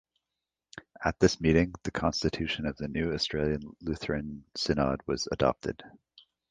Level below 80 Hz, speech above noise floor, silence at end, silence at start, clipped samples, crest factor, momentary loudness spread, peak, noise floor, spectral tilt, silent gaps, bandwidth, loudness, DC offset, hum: -46 dBFS; 59 dB; 0.65 s; 0.75 s; under 0.1%; 24 dB; 12 LU; -8 dBFS; -88 dBFS; -5.5 dB/octave; none; 9.8 kHz; -30 LUFS; under 0.1%; none